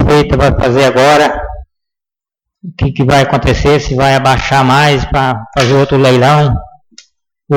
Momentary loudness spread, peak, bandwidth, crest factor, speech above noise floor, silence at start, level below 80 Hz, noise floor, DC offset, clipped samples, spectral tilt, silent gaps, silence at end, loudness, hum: 8 LU; -2 dBFS; 16.5 kHz; 8 dB; 77 dB; 0 s; -26 dBFS; -86 dBFS; under 0.1%; under 0.1%; -6 dB/octave; none; 0 s; -9 LUFS; none